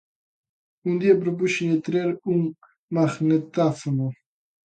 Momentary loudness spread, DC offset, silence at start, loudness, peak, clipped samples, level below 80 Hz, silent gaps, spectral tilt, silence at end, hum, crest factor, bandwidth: 9 LU; under 0.1%; 0.85 s; -23 LUFS; -6 dBFS; under 0.1%; -68 dBFS; 2.78-2.88 s; -7 dB/octave; 0.55 s; none; 18 dB; 9.2 kHz